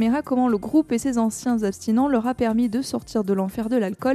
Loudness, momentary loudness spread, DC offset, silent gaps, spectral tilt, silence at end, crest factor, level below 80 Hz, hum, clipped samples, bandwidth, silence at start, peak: -22 LUFS; 4 LU; under 0.1%; none; -6 dB/octave; 0 s; 12 dB; -52 dBFS; none; under 0.1%; 14 kHz; 0 s; -10 dBFS